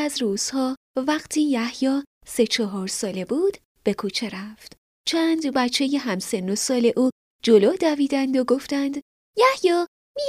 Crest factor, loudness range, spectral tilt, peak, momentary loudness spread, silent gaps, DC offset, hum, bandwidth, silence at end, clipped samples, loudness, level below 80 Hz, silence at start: 18 dB; 4 LU; -3.5 dB/octave; -4 dBFS; 10 LU; 0.77-0.94 s, 2.07-2.21 s, 3.65-3.75 s, 4.78-5.04 s, 7.12-7.39 s, 9.02-9.34 s, 9.88-10.15 s; under 0.1%; none; 15.5 kHz; 0 s; under 0.1%; -23 LUFS; -64 dBFS; 0 s